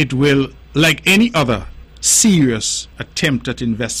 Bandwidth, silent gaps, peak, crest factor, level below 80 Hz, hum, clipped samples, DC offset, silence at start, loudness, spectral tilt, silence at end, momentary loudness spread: 16 kHz; none; -2 dBFS; 14 dB; -38 dBFS; none; under 0.1%; under 0.1%; 0 s; -15 LUFS; -3.5 dB/octave; 0 s; 10 LU